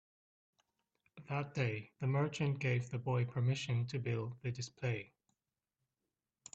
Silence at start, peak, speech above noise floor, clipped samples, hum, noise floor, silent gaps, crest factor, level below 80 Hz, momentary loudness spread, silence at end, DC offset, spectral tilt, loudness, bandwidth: 1.15 s; -22 dBFS; over 53 dB; under 0.1%; none; under -90 dBFS; none; 18 dB; -74 dBFS; 8 LU; 1.5 s; under 0.1%; -6.5 dB/octave; -38 LUFS; 8.2 kHz